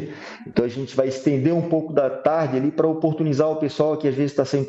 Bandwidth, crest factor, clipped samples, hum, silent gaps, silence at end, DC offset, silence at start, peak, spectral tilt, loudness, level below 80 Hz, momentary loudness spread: 8 kHz; 16 dB; under 0.1%; none; none; 0 s; under 0.1%; 0 s; -6 dBFS; -7.5 dB/octave; -21 LUFS; -60 dBFS; 4 LU